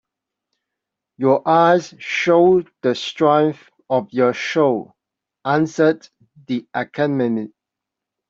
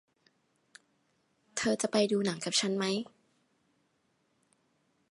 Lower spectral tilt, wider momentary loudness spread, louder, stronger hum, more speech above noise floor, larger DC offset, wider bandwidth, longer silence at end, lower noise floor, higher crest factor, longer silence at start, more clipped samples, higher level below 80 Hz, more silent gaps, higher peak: first, -6 dB/octave vs -3.5 dB/octave; first, 12 LU vs 9 LU; first, -18 LUFS vs -31 LUFS; neither; first, 66 dB vs 45 dB; neither; second, 7.6 kHz vs 11.5 kHz; second, 0.8 s vs 2.05 s; first, -84 dBFS vs -75 dBFS; second, 16 dB vs 22 dB; second, 1.2 s vs 1.55 s; neither; first, -64 dBFS vs -76 dBFS; neither; first, -2 dBFS vs -14 dBFS